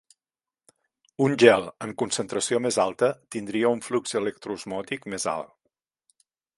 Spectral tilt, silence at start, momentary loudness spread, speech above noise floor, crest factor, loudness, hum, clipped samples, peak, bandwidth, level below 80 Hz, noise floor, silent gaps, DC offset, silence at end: -4 dB/octave; 1.2 s; 16 LU; over 65 dB; 26 dB; -25 LUFS; none; under 0.1%; 0 dBFS; 11.5 kHz; -68 dBFS; under -90 dBFS; none; under 0.1%; 1.1 s